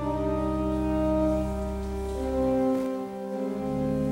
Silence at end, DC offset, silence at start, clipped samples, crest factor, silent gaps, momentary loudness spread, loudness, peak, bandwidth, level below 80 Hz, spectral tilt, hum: 0 s; under 0.1%; 0 s; under 0.1%; 12 dB; none; 7 LU; -28 LUFS; -14 dBFS; 16.5 kHz; -38 dBFS; -8 dB/octave; none